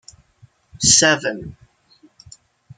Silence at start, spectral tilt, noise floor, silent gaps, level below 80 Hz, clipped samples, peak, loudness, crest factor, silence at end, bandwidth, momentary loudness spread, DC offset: 0.8 s; -1.5 dB/octave; -54 dBFS; none; -48 dBFS; under 0.1%; 0 dBFS; -14 LUFS; 22 dB; 1.25 s; 11 kHz; 22 LU; under 0.1%